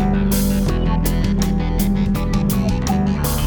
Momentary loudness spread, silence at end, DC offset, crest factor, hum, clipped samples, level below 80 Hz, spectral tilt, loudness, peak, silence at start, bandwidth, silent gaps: 2 LU; 0 s; under 0.1%; 12 dB; none; under 0.1%; -22 dBFS; -6 dB/octave; -19 LUFS; -6 dBFS; 0 s; over 20 kHz; none